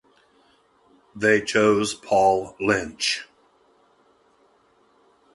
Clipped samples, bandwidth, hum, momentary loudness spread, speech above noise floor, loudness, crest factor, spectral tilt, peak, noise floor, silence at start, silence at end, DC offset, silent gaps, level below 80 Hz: under 0.1%; 11.5 kHz; none; 5 LU; 40 dB; -21 LUFS; 22 dB; -3.5 dB/octave; -4 dBFS; -61 dBFS; 1.15 s; 2.1 s; under 0.1%; none; -58 dBFS